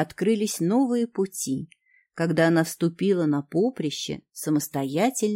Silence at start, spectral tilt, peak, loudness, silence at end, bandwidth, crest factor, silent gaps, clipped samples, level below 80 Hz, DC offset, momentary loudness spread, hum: 0 s; -5.5 dB/octave; -6 dBFS; -25 LUFS; 0 s; 16.5 kHz; 18 dB; none; under 0.1%; -66 dBFS; under 0.1%; 10 LU; none